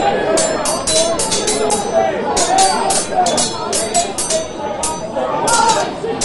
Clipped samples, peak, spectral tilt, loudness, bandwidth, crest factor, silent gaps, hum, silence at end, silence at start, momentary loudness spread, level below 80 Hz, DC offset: under 0.1%; 0 dBFS; -2 dB/octave; -15 LUFS; 12 kHz; 16 dB; none; none; 0 s; 0 s; 7 LU; -42 dBFS; under 0.1%